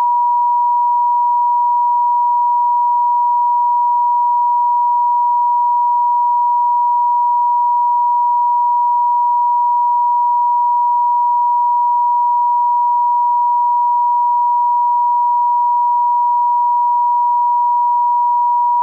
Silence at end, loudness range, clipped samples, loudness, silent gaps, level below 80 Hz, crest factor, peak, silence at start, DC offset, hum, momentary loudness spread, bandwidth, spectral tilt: 0 s; 0 LU; under 0.1%; -14 LUFS; none; under -90 dBFS; 4 dB; -10 dBFS; 0 s; under 0.1%; none; 0 LU; 1.1 kHz; 8.5 dB/octave